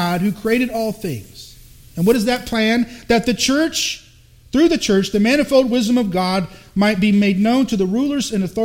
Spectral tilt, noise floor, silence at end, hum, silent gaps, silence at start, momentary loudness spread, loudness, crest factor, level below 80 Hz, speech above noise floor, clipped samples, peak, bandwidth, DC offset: -5 dB/octave; -45 dBFS; 0 s; none; none; 0 s; 8 LU; -17 LUFS; 16 dB; -44 dBFS; 28 dB; under 0.1%; -2 dBFS; 17 kHz; under 0.1%